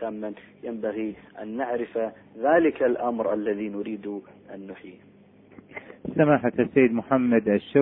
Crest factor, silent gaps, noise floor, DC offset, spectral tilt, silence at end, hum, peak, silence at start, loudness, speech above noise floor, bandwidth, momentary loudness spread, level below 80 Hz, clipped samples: 20 dB; none; -51 dBFS; under 0.1%; -11.5 dB/octave; 0 s; none; -6 dBFS; 0 s; -25 LUFS; 26 dB; 3.9 kHz; 20 LU; -64 dBFS; under 0.1%